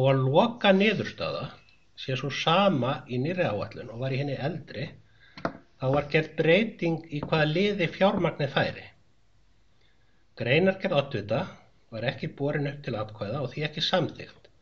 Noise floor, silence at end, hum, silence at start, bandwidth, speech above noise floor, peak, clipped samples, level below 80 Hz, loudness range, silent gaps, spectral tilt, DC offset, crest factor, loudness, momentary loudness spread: -66 dBFS; 0.3 s; none; 0 s; 7.2 kHz; 39 dB; -6 dBFS; under 0.1%; -60 dBFS; 5 LU; none; -4.5 dB/octave; 0.2%; 20 dB; -27 LUFS; 14 LU